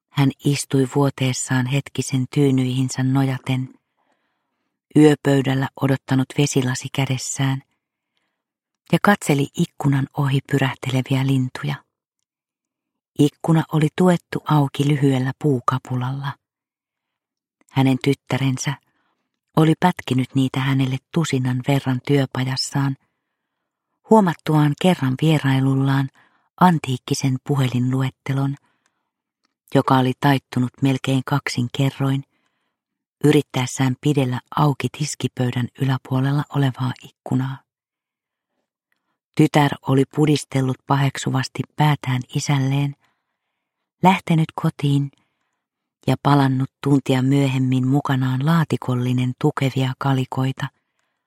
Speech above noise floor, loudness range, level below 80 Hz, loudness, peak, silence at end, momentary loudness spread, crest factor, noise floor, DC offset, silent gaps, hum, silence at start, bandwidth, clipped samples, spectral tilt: 70 dB; 4 LU; -60 dBFS; -20 LUFS; -2 dBFS; 0.6 s; 8 LU; 20 dB; -89 dBFS; under 0.1%; 26.50-26.54 s, 33.07-33.13 s, 39.24-39.32 s; none; 0.15 s; 15 kHz; under 0.1%; -6 dB/octave